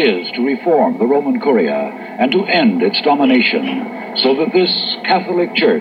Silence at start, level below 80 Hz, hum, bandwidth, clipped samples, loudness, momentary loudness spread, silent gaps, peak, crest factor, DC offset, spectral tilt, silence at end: 0 s; -68 dBFS; none; 5.4 kHz; under 0.1%; -15 LUFS; 6 LU; none; 0 dBFS; 14 dB; under 0.1%; -7 dB/octave; 0 s